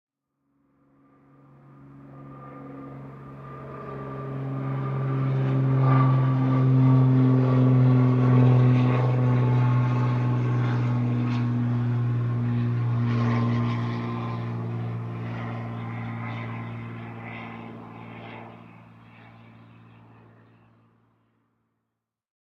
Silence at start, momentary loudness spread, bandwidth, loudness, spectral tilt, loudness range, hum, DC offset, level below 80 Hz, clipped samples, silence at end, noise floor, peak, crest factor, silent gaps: 1.9 s; 22 LU; 4.9 kHz; -23 LUFS; -10 dB/octave; 21 LU; none; under 0.1%; -56 dBFS; under 0.1%; 3.85 s; -83 dBFS; -8 dBFS; 16 dB; none